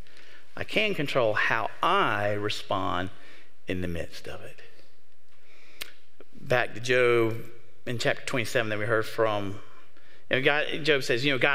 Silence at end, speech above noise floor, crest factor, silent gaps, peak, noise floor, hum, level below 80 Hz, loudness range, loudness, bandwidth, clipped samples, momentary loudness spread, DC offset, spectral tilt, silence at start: 0 s; 38 dB; 22 dB; none; -6 dBFS; -65 dBFS; none; -62 dBFS; 9 LU; -27 LUFS; 16 kHz; under 0.1%; 18 LU; 3%; -4.5 dB/octave; 0.55 s